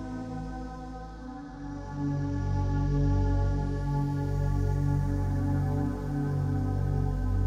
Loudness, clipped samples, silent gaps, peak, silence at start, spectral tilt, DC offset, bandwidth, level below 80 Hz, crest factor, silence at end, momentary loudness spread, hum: -30 LUFS; under 0.1%; none; -16 dBFS; 0 s; -9 dB/octave; under 0.1%; 7.6 kHz; -34 dBFS; 12 dB; 0 s; 13 LU; none